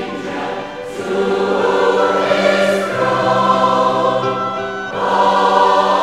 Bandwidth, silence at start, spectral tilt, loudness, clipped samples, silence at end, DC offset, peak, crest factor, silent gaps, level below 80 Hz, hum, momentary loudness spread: 14 kHz; 0 s; -5 dB/octave; -15 LUFS; under 0.1%; 0 s; 0.3%; -2 dBFS; 14 dB; none; -54 dBFS; none; 11 LU